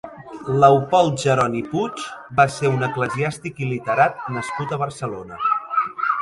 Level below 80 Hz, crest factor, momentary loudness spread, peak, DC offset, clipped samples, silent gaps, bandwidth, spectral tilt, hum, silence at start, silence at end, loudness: -56 dBFS; 20 dB; 12 LU; 0 dBFS; under 0.1%; under 0.1%; none; 11.5 kHz; -6 dB/octave; none; 0.05 s; 0 s; -20 LUFS